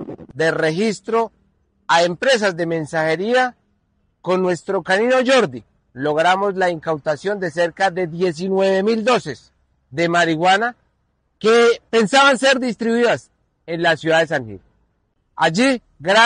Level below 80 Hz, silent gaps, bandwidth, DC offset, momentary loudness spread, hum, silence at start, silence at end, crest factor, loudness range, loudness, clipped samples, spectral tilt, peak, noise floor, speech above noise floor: -60 dBFS; none; 10 kHz; under 0.1%; 10 LU; none; 0 s; 0 s; 16 dB; 4 LU; -18 LUFS; under 0.1%; -4.5 dB/octave; -4 dBFS; -66 dBFS; 49 dB